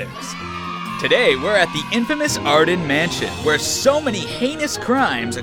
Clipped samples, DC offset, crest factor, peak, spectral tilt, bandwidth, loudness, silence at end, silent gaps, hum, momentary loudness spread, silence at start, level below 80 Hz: under 0.1%; under 0.1%; 16 dB; -4 dBFS; -3.5 dB/octave; 19 kHz; -18 LUFS; 0 s; none; none; 12 LU; 0 s; -46 dBFS